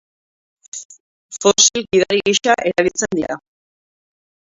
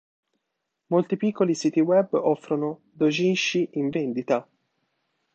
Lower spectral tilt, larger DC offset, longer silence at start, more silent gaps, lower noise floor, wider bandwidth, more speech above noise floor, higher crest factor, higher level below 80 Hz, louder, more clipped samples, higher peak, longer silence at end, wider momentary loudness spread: second, -2 dB/octave vs -5.5 dB/octave; neither; second, 0.75 s vs 0.9 s; first, 0.85-0.89 s, 1.00-1.29 s vs none; first, under -90 dBFS vs -81 dBFS; about the same, 7.8 kHz vs 8.2 kHz; first, over 74 dB vs 57 dB; about the same, 20 dB vs 16 dB; first, -56 dBFS vs -74 dBFS; first, -15 LUFS vs -24 LUFS; neither; first, 0 dBFS vs -8 dBFS; first, 1.25 s vs 0.95 s; first, 20 LU vs 7 LU